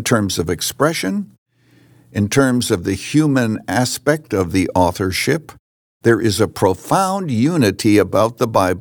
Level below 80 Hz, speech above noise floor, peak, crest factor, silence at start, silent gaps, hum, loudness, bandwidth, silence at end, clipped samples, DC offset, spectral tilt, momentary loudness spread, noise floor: -52 dBFS; 35 dB; -2 dBFS; 16 dB; 0 s; 1.38-1.46 s, 5.59-6.00 s; none; -17 LUFS; over 20 kHz; 0 s; under 0.1%; under 0.1%; -5 dB/octave; 5 LU; -52 dBFS